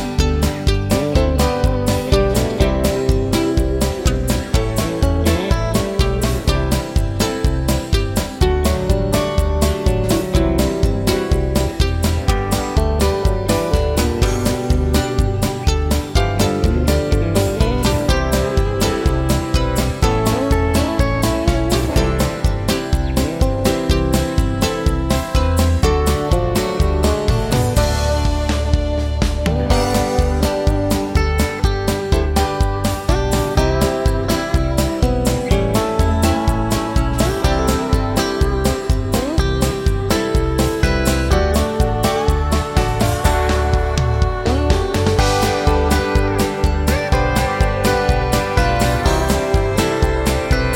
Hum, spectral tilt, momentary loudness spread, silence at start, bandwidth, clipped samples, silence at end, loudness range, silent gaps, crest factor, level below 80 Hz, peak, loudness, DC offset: none; -5.5 dB/octave; 3 LU; 0 s; 17 kHz; under 0.1%; 0 s; 1 LU; none; 16 dB; -20 dBFS; 0 dBFS; -17 LUFS; under 0.1%